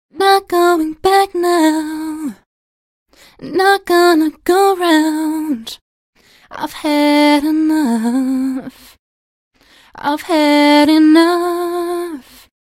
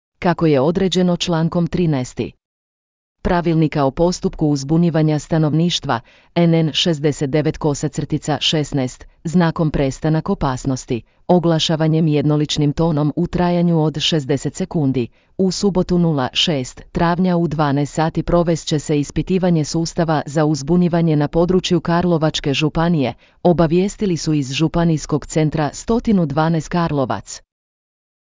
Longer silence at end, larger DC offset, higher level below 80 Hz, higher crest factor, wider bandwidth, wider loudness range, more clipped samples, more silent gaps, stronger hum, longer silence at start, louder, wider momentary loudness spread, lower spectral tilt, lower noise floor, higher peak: second, 0.4 s vs 0.8 s; neither; second, -54 dBFS vs -38 dBFS; about the same, 14 dB vs 14 dB; first, 16 kHz vs 7.6 kHz; about the same, 3 LU vs 2 LU; neither; first, 2.46-3.06 s, 5.81-6.13 s, 8.99-9.51 s vs 2.45-3.15 s; neither; about the same, 0.15 s vs 0.2 s; first, -13 LUFS vs -18 LUFS; first, 16 LU vs 6 LU; second, -3 dB/octave vs -6 dB/octave; about the same, under -90 dBFS vs under -90 dBFS; about the same, 0 dBFS vs -2 dBFS